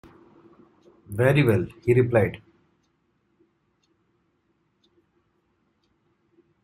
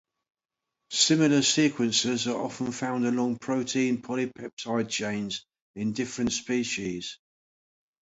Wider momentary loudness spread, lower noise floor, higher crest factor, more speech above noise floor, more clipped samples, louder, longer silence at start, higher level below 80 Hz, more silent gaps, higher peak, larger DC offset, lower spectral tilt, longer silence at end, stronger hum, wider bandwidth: about the same, 13 LU vs 12 LU; second, -70 dBFS vs -86 dBFS; about the same, 20 dB vs 20 dB; second, 49 dB vs 59 dB; neither; first, -22 LUFS vs -27 LUFS; first, 1.1 s vs 0.9 s; first, -58 dBFS vs -64 dBFS; second, none vs 4.53-4.57 s, 5.62-5.74 s; first, -6 dBFS vs -10 dBFS; neither; first, -8 dB/octave vs -3.5 dB/octave; first, 4.25 s vs 0.85 s; neither; first, 15.5 kHz vs 8 kHz